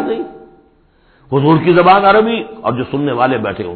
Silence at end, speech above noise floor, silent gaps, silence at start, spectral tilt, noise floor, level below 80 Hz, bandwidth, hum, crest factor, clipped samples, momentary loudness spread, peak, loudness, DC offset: 0 s; 39 dB; none; 0 s; -10.5 dB/octave; -51 dBFS; -46 dBFS; 4.6 kHz; none; 14 dB; under 0.1%; 12 LU; 0 dBFS; -13 LUFS; under 0.1%